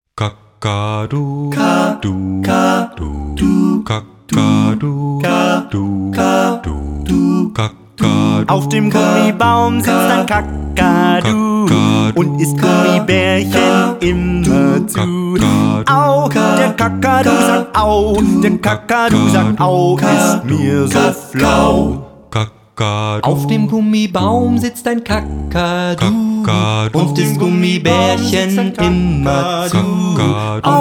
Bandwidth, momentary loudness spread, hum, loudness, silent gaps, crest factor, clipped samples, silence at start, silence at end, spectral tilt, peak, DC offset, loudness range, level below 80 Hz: 18.5 kHz; 7 LU; none; -13 LUFS; none; 12 dB; under 0.1%; 0.15 s; 0 s; -6 dB/octave; 0 dBFS; under 0.1%; 3 LU; -32 dBFS